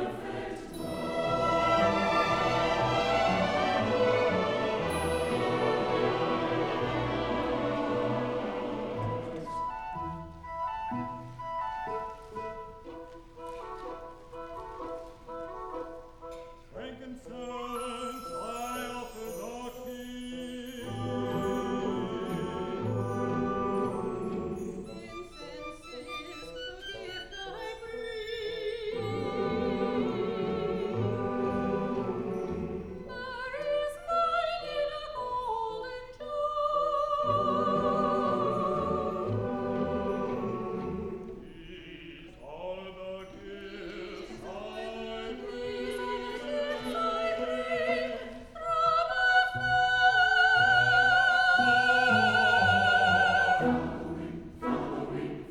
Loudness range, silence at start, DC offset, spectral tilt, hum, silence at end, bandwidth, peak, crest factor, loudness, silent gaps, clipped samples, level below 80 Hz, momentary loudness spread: 17 LU; 0 s; under 0.1%; -5 dB/octave; none; 0 s; 18 kHz; -12 dBFS; 18 dB; -30 LUFS; none; under 0.1%; -52 dBFS; 19 LU